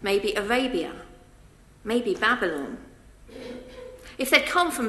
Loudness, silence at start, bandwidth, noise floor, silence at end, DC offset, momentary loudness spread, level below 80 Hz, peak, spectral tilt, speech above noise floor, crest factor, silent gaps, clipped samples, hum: -24 LUFS; 0 s; 13 kHz; -52 dBFS; 0 s; under 0.1%; 22 LU; -52 dBFS; 0 dBFS; -3 dB/octave; 27 dB; 26 dB; none; under 0.1%; none